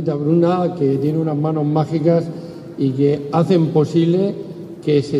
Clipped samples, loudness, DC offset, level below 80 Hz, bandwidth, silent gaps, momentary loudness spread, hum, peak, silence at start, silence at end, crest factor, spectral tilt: under 0.1%; -17 LUFS; under 0.1%; -60 dBFS; 10.5 kHz; none; 12 LU; none; -4 dBFS; 0 s; 0 s; 14 dB; -9 dB/octave